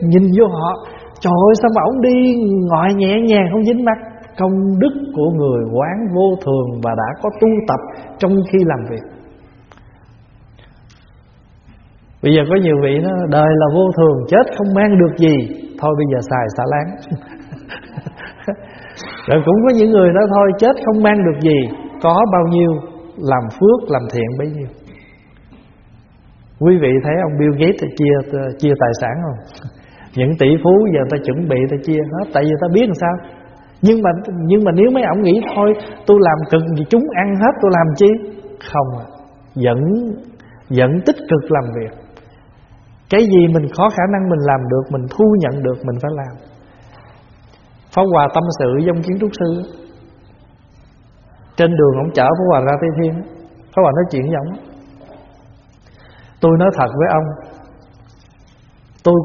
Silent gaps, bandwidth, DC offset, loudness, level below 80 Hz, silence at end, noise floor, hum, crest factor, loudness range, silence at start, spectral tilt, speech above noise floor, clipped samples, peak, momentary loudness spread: none; 6.8 kHz; under 0.1%; -14 LUFS; -46 dBFS; 0 s; -46 dBFS; none; 14 dB; 6 LU; 0 s; -7 dB/octave; 33 dB; under 0.1%; 0 dBFS; 15 LU